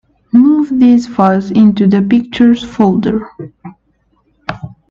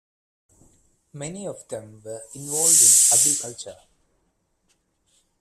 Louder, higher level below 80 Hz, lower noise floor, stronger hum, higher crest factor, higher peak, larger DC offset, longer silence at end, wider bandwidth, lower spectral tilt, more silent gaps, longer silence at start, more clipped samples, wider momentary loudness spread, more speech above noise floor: first, -10 LUFS vs -15 LUFS; first, -46 dBFS vs -68 dBFS; second, -57 dBFS vs -70 dBFS; neither; second, 12 dB vs 22 dB; about the same, 0 dBFS vs -2 dBFS; neither; second, 0.2 s vs 1.7 s; second, 7.4 kHz vs 15.5 kHz; first, -8 dB/octave vs -0.5 dB/octave; neither; second, 0.35 s vs 1.15 s; neither; second, 18 LU vs 26 LU; about the same, 47 dB vs 49 dB